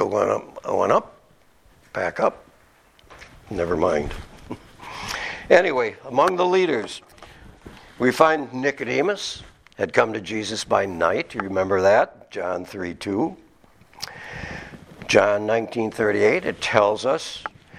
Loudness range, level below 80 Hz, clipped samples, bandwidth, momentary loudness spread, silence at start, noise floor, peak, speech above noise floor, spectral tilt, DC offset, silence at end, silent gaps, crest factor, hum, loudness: 6 LU; -50 dBFS; under 0.1%; 15 kHz; 17 LU; 0 s; -56 dBFS; 0 dBFS; 35 dB; -4.5 dB/octave; under 0.1%; 0 s; none; 22 dB; none; -22 LUFS